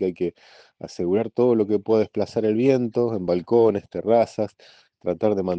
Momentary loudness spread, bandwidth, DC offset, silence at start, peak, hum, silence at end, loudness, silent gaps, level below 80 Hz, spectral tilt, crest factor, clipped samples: 10 LU; 8.2 kHz; under 0.1%; 0 s; -6 dBFS; none; 0 s; -22 LUFS; none; -66 dBFS; -8 dB/octave; 16 dB; under 0.1%